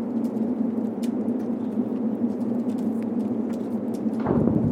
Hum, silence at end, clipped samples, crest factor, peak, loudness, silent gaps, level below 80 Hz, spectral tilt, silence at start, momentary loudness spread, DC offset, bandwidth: none; 0 s; under 0.1%; 18 dB; -8 dBFS; -26 LUFS; none; -54 dBFS; -9.5 dB/octave; 0 s; 4 LU; under 0.1%; 10.5 kHz